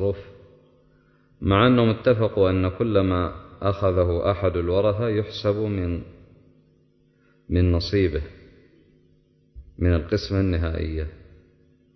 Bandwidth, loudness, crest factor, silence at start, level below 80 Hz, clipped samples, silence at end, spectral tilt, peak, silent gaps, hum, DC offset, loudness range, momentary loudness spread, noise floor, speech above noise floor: 6.2 kHz; -23 LUFS; 18 dB; 0 s; -34 dBFS; under 0.1%; 0.8 s; -8.5 dB/octave; -6 dBFS; none; none; under 0.1%; 6 LU; 11 LU; -61 dBFS; 39 dB